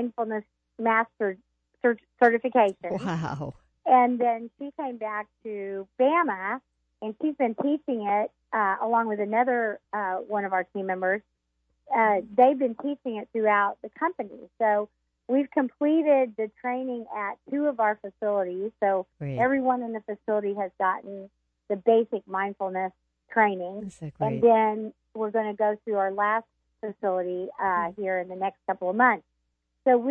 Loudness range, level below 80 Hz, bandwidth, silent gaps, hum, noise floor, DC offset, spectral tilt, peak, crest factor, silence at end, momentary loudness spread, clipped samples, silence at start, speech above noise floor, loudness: 3 LU; -70 dBFS; 8.6 kHz; none; none; -77 dBFS; under 0.1%; -8 dB/octave; -6 dBFS; 20 dB; 0 s; 12 LU; under 0.1%; 0 s; 51 dB; -26 LUFS